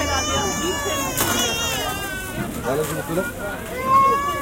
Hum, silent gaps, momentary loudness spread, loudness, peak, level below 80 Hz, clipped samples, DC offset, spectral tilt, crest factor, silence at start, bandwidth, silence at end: none; none; 11 LU; -21 LUFS; -6 dBFS; -40 dBFS; under 0.1%; under 0.1%; -3 dB/octave; 16 dB; 0 s; 17 kHz; 0 s